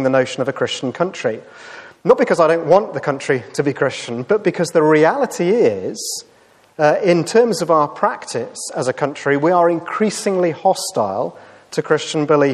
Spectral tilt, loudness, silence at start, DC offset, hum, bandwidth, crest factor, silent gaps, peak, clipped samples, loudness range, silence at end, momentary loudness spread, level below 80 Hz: -5 dB/octave; -17 LUFS; 0 s; under 0.1%; none; 13.5 kHz; 16 dB; none; 0 dBFS; under 0.1%; 2 LU; 0 s; 11 LU; -66 dBFS